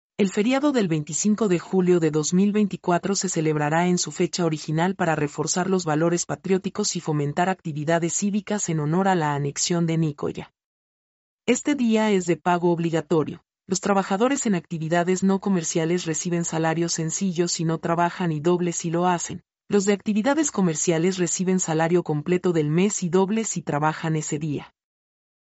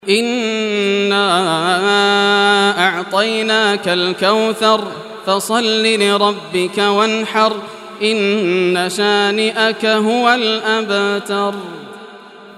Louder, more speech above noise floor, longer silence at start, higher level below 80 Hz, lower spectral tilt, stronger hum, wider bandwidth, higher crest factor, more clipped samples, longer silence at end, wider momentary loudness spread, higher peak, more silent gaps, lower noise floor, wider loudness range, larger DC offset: second, -23 LUFS vs -14 LUFS; first, over 68 dB vs 22 dB; first, 0.2 s vs 0.05 s; first, -64 dBFS vs -70 dBFS; first, -5 dB/octave vs -3.5 dB/octave; neither; second, 8.2 kHz vs 14 kHz; about the same, 16 dB vs 14 dB; neither; first, 0.95 s vs 0 s; second, 4 LU vs 7 LU; second, -8 dBFS vs 0 dBFS; first, 10.64-11.38 s vs none; first, under -90 dBFS vs -37 dBFS; about the same, 2 LU vs 2 LU; neither